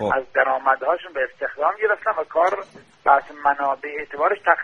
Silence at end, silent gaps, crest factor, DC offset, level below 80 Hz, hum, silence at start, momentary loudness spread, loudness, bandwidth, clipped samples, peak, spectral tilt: 0 s; none; 20 dB; under 0.1%; -60 dBFS; none; 0 s; 8 LU; -21 LUFS; 7 kHz; under 0.1%; 0 dBFS; -5 dB/octave